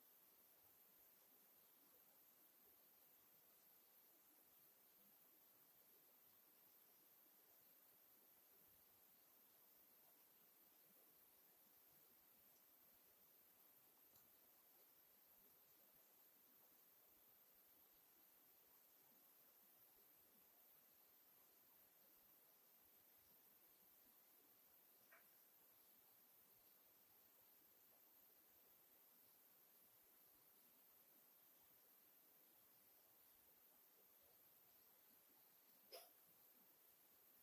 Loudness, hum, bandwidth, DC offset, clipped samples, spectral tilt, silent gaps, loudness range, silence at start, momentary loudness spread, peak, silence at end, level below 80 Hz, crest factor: -69 LUFS; none; 16 kHz; under 0.1%; under 0.1%; -1.5 dB/octave; none; 0 LU; 0 s; 1 LU; -44 dBFS; 0 s; under -90 dBFS; 28 dB